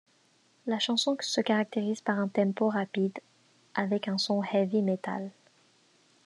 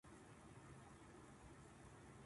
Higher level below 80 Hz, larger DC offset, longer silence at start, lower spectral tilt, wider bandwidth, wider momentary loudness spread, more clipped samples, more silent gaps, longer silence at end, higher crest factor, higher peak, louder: second, -88 dBFS vs -72 dBFS; neither; first, 0.65 s vs 0.05 s; about the same, -5 dB/octave vs -5 dB/octave; about the same, 11.5 kHz vs 11.5 kHz; first, 9 LU vs 1 LU; neither; neither; first, 0.95 s vs 0 s; first, 18 dB vs 12 dB; first, -12 dBFS vs -50 dBFS; first, -29 LUFS vs -62 LUFS